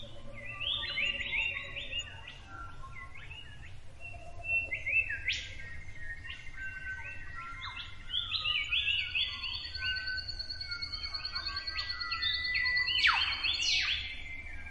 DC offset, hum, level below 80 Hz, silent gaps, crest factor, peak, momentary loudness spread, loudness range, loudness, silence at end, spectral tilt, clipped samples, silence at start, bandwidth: under 0.1%; none; -50 dBFS; none; 20 dB; -14 dBFS; 19 LU; 9 LU; -32 LUFS; 0 s; -1 dB/octave; under 0.1%; 0 s; 11.5 kHz